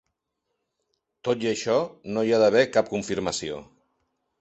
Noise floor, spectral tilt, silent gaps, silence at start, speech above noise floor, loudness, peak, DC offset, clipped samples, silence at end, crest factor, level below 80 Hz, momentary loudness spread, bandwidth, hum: -80 dBFS; -4.5 dB/octave; none; 1.25 s; 56 dB; -24 LUFS; -6 dBFS; under 0.1%; under 0.1%; 0.8 s; 20 dB; -60 dBFS; 13 LU; 8.4 kHz; none